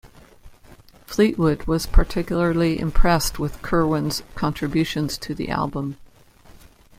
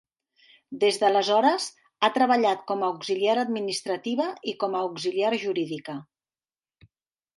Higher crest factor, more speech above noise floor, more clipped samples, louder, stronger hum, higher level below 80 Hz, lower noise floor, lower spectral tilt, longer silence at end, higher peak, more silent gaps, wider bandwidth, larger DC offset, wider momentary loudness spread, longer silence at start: about the same, 18 dB vs 20 dB; second, 29 dB vs over 65 dB; neither; about the same, -23 LUFS vs -25 LUFS; neither; first, -26 dBFS vs -78 dBFS; second, -49 dBFS vs under -90 dBFS; first, -5.5 dB/octave vs -3.5 dB/octave; second, 0.95 s vs 1.35 s; first, -2 dBFS vs -6 dBFS; neither; first, 16 kHz vs 11.5 kHz; neither; about the same, 8 LU vs 10 LU; second, 0.05 s vs 0.7 s